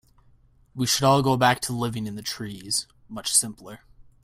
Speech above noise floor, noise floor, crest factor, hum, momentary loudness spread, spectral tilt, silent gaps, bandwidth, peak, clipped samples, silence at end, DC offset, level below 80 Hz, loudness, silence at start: 33 dB; -57 dBFS; 20 dB; none; 19 LU; -3.5 dB/octave; none; 16 kHz; -6 dBFS; under 0.1%; 0.2 s; under 0.1%; -56 dBFS; -23 LUFS; 0.75 s